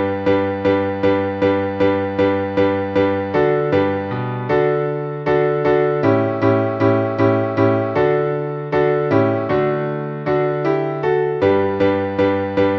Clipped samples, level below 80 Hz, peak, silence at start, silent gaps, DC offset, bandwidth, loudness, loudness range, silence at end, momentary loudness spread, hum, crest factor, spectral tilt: under 0.1%; -52 dBFS; -2 dBFS; 0 s; none; under 0.1%; 6.2 kHz; -18 LUFS; 1 LU; 0 s; 4 LU; none; 14 dB; -9 dB/octave